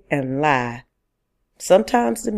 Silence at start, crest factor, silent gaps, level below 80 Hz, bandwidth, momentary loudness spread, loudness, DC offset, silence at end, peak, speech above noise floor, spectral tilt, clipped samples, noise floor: 0.1 s; 20 dB; none; -52 dBFS; 15 kHz; 16 LU; -19 LUFS; under 0.1%; 0 s; -2 dBFS; 54 dB; -5 dB/octave; under 0.1%; -73 dBFS